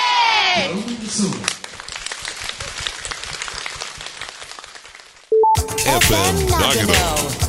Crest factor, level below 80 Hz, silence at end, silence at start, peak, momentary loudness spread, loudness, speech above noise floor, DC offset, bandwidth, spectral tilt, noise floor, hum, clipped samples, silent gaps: 20 dB; -34 dBFS; 0 s; 0 s; 0 dBFS; 16 LU; -18 LUFS; 25 dB; under 0.1%; 16.5 kHz; -3 dB/octave; -42 dBFS; none; under 0.1%; none